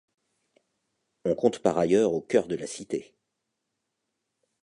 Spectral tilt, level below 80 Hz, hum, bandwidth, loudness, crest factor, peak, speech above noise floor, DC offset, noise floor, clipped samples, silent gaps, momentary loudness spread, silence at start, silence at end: -5.5 dB/octave; -64 dBFS; none; 11 kHz; -26 LUFS; 22 dB; -8 dBFS; 56 dB; under 0.1%; -82 dBFS; under 0.1%; none; 11 LU; 1.25 s; 1.6 s